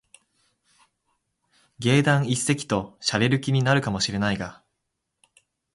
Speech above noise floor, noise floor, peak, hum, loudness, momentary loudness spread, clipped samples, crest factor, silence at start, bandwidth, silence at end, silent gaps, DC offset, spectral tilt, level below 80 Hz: 57 dB; -80 dBFS; -8 dBFS; none; -23 LUFS; 8 LU; under 0.1%; 18 dB; 1.8 s; 11.5 kHz; 1.2 s; none; under 0.1%; -5 dB/octave; -54 dBFS